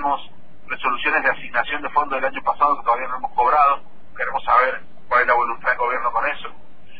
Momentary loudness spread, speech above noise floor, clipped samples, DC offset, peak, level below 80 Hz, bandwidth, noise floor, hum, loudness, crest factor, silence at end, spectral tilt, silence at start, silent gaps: 9 LU; 25 dB; under 0.1%; 3%; -4 dBFS; -48 dBFS; 5 kHz; -45 dBFS; none; -20 LUFS; 18 dB; 0.3 s; -6.5 dB/octave; 0 s; none